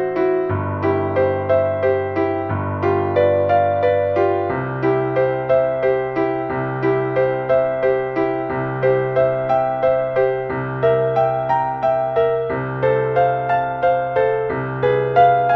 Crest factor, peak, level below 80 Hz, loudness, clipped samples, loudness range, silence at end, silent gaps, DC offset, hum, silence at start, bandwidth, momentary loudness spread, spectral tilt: 16 dB; -2 dBFS; -50 dBFS; -18 LUFS; under 0.1%; 1 LU; 0 s; none; under 0.1%; none; 0 s; 6 kHz; 4 LU; -9.5 dB/octave